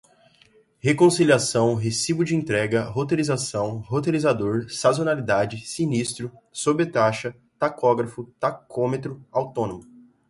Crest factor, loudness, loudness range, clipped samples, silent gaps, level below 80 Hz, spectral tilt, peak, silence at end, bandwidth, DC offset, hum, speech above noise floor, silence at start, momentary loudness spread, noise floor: 18 dB; -23 LUFS; 3 LU; under 0.1%; none; -58 dBFS; -5 dB/octave; -4 dBFS; 0.45 s; 11.5 kHz; under 0.1%; none; 35 dB; 0.85 s; 10 LU; -58 dBFS